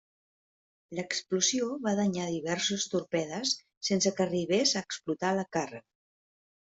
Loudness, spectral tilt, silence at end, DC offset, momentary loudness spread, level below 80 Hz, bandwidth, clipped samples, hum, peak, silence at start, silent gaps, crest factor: -30 LUFS; -3.5 dB/octave; 0.95 s; under 0.1%; 8 LU; -72 dBFS; 8.2 kHz; under 0.1%; none; -14 dBFS; 0.9 s; 3.77-3.81 s; 18 dB